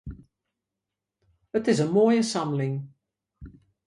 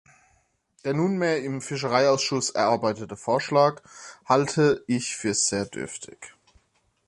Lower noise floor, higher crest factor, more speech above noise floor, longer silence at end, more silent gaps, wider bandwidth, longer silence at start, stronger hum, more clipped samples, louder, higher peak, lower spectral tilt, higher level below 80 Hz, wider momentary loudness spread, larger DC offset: first, -87 dBFS vs -68 dBFS; about the same, 18 dB vs 20 dB; first, 63 dB vs 44 dB; second, 0.35 s vs 0.8 s; neither; about the same, 11.5 kHz vs 11.5 kHz; second, 0.05 s vs 0.85 s; neither; neither; about the same, -24 LUFS vs -24 LUFS; second, -10 dBFS vs -6 dBFS; first, -6 dB/octave vs -4 dB/octave; first, -54 dBFS vs -62 dBFS; about the same, 17 LU vs 15 LU; neither